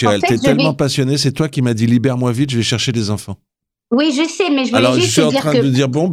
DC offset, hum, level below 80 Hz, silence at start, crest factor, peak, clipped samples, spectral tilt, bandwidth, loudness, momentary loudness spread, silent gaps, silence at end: under 0.1%; none; -50 dBFS; 0 s; 14 dB; 0 dBFS; under 0.1%; -5 dB/octave; 15 kHz; -15 LUFS; 6 LU; none; 0 s